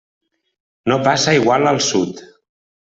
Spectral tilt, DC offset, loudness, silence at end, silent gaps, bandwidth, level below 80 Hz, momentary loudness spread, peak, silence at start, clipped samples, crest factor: -4 dB/octave; under 0.1%; -16 LUFS; 0.65 s; none; 8.4 kHz; -56 dBFS; 12 LU; -2 dBFS; 0.85 s; under 0.1%; 16 dB